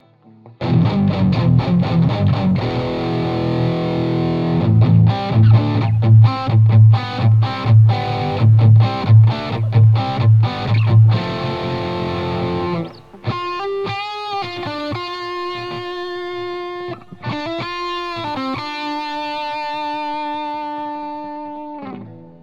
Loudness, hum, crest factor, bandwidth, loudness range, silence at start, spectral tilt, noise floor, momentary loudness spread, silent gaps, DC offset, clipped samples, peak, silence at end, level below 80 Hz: -17 LUFS; none; 14 dB; 5.6 kHz; 12 LU; 0.45 s; -9 dB/octave; -45 dBFS; 14 LU; none; under 0.1%; under 0.1%; -2 dBFS; 0.1 s; -44 dBFS